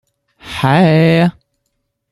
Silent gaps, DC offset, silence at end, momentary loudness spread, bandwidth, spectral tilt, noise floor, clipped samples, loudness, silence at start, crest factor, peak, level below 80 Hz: none; under 0.1%; 0.8 s; 8 LU; 12 kHz; -7.5 dB/octave; -69 dBFS; under 0.1%; -12 LUFS; 0.45 s; 14 dB; 0 dBFS; -48 dBFS